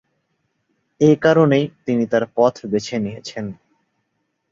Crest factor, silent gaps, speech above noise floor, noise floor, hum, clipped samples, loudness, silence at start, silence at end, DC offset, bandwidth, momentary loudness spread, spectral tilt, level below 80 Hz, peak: 18 dB; none; 55 dB; -72 dBFS; none; under 0.1%; -18 LUFS; 1 s; 1 s; under 0.1%; 7.8 kHz; 15 LU; -7 dB/octave; -58 dBFS; -2 dBFS